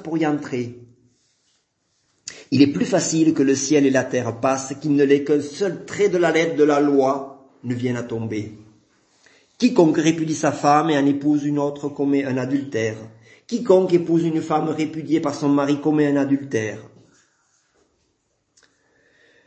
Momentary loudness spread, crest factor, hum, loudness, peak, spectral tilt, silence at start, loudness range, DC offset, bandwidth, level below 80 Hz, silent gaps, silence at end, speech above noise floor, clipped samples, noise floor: 12 LU; 20 dB; none; -20 LUFS; -2 dBFS; -5.5 dB/octave; 0 s; 4 LU; under 0.1%; 8.6 kHz; -66 dBFS; none; 2.6 s; 50 dB; under 0.1%; -69 dBFS